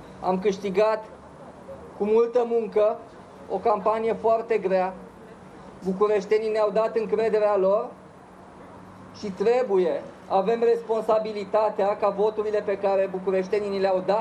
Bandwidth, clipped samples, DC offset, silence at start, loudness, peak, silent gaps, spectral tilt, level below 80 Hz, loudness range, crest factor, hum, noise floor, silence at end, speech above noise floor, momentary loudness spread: 9.4 kHz; under 0.1%; under 0.1%; 0 s; -24 LUFS; -10 dBFS; none; -6.5 dB/octave; -62 dBFS; 2 LU; 16 dB; none; -47 dBFS; 0 s; 23 dB; 21 LU